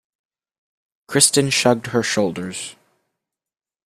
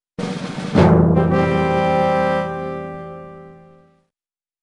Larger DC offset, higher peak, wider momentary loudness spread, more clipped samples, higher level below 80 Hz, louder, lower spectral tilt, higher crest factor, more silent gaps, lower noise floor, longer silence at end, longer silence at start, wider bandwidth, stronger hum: neither; about the same, 0 dBFS vs -2 dBFS; second, 15 LU vs 19 LU; neither; second, -60 dBFS vs -42 dBFS; about the same, -18 LUFS vs -17 LUFS; second, -3 dB/octave vs -8 dB/octave; about the same, 22 dB vs 18 dB; neither; about the same, under -90 dBFS vs under -90 dBFS; about the same, 1.15 s vs 1.1 s; first, 1.1 s vs 0.2 s; first, 15.5 kHz vs 10 kHz; neither